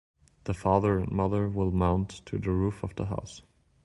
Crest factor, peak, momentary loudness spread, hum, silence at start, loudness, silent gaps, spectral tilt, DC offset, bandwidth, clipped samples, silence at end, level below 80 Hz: 20 dB; -10 dBFS; 12 LU; none; 0.45 s; -29 LUFS; none; -8 dB/octave; under 0.1%; 11.5 kHz; under 0.1%; 0.45 s; -42 dBFS